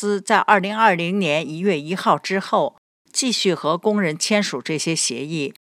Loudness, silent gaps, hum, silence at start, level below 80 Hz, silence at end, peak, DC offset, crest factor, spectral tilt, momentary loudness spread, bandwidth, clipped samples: -20 LUFS; 2.78-3.05 s; none; 0 s; -78 dBFS; 0.15 s; 0 dBFS; under 0.1%; 20 dB; -3.5 dB/octave; 7 LU; 14.5 kHz; under 0.1%